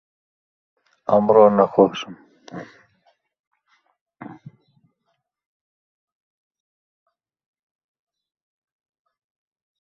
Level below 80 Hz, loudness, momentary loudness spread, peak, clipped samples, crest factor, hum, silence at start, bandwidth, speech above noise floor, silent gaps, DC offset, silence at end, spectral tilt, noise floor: -68 dBFS; -16 LUFS; 27 LU; -2 dBFS; under 0.1%; 24 dB; none; 1.1 s; 6.4 kHz; 57 dB; 3.40-3.51 s, 4.01-4.06 s; under 0.1%; 5.65 s; -7.5 dB/octave; -74 dBFS